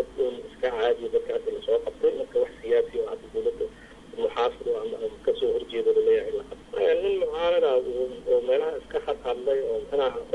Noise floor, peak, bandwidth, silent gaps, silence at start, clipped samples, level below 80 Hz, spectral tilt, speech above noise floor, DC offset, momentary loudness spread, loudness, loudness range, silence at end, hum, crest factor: -46 dBFS; -14 dBFS; 11 kHz; none; 0 s; under 0.1%; -54 dBFS; -5 dB/octave; 20 dB; under 0.1%; 8 LU; -26 LUFS; 3 LU; 0 s; none; 12 dB